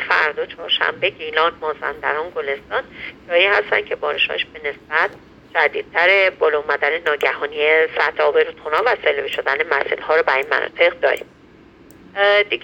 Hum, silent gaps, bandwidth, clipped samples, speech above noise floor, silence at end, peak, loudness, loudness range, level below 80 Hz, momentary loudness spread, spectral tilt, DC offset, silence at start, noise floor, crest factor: none; none; 17.5 kHz; under 0.1%; 28 dB; 0.05 s; 0 dBFS; -18 LUFS; 3 LU; -56 dBFS; 10 LU; -3.5 dB/octave; under 0.1%; 0 s; -46 dBFS; 18 dB